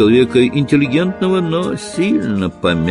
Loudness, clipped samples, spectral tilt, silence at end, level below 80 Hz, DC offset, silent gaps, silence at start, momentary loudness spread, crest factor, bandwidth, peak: -15 LUFS; under 0.1%; -6.5 dB/octave; 0 s; -40 dBFS; under 0.1%; none; 0 s; 7 LU; 14 dB; 11.5 kHz; 0 dBFS